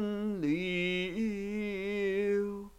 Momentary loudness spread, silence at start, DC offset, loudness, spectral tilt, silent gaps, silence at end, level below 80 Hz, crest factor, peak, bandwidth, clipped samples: 4 LU; 0 s; under 0.1%; -33 LUFS; -6.5 dB/octave; none; 0.1 s; -58 dBFS; 12 dB; -20 dBFS; 15 kHz; under 0.1%